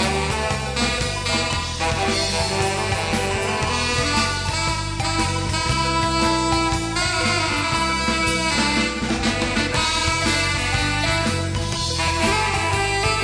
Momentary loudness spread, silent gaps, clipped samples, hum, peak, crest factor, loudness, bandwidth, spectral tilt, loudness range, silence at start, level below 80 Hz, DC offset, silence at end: 3 LU; none; under 0.1%; none; -6 dBFS; 14 dB; -20 LUFS; 11 kHz; -3.5 dB/octave; 2 LU; 0 s; -32 dBFS; under 0.1%; 0 s